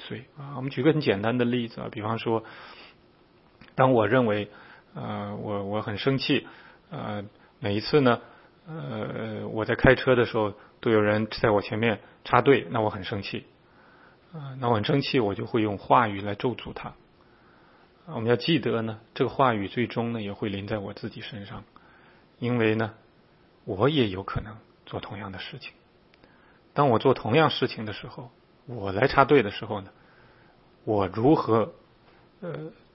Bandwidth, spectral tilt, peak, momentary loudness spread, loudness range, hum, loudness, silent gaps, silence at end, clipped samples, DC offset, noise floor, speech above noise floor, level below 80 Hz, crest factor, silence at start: 5.8 kHz; -10.5 dB/octave; -2 dBFS; 18 LU; 6 LU; none; -26 LUFS; none; 0.25 s; under 0.1%; under 0.1%; -59 dBFS; 33 dB; -52 dBFS; 26 dB; 0 s